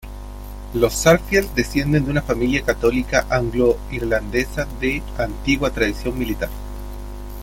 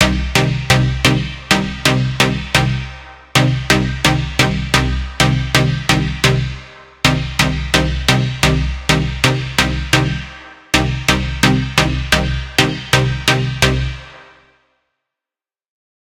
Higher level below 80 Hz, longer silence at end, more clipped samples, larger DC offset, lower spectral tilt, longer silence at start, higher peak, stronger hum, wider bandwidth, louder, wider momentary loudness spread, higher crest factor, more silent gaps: about the same, -30 dBFS vs -26 dBFS; second, 0 s vs 1.9 s; neither; neither; about the same, -5 dB/octave vs -4 dB/octave; about the same, 0 s vs 0 s; about the same, 0 dBFS vs 0 dBFS; first, 50 Hz at -30 dBFS vs none; about the same, 17 kHz vs 17 kHz; second, -20 LUFS vs -15 LUFS; first, 17 LU vs 6 LU; about the same, 20 dB vs 16 dB; neither